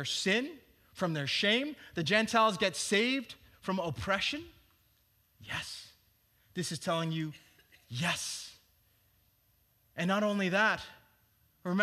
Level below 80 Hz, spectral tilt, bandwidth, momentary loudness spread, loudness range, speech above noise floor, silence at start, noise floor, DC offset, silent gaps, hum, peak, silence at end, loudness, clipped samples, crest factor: -68 dBFS; -4 dB/octave; 15 kHz; 15 LU; 9 LU; 39 dB; 0 s; -71 dBFS; under 0.1%; none; none; -12 dBFS; 0 s; -32 LUFS; under 0.1%; 22 dB